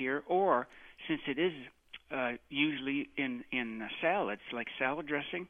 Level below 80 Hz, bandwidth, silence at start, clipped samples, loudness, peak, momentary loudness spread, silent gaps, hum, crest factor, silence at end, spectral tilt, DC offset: -70 dBFS; 3.8 kHz; 0 s; under 0.1%; -34 LUFS; -14 dBFS; 10 LU; none; none; 20 dB; 0.05 s; -7 dB/octave; under 0.1%